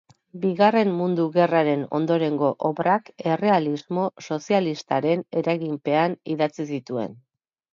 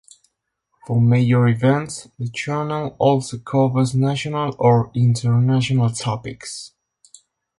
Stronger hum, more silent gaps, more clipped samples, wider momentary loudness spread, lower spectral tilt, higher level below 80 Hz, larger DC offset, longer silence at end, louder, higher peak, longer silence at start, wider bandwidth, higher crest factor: neither; neither; neither; second, 8 LU vs 13 LU; about the same, -7 dB/octave vs -6.5 dB/octave; second, -72 dBFS vs -54 dBFS; neither; second, 0.6 s vs 0.9 s; second, -23 LUFS vs -19 LUFS; about the same, -6 dBFS vs -4 dBFS; second, 0.35 s vs 0.9 s; second, 7.4 kHz vs 11.5 kHz; about the same, 18 dB vs 16 dB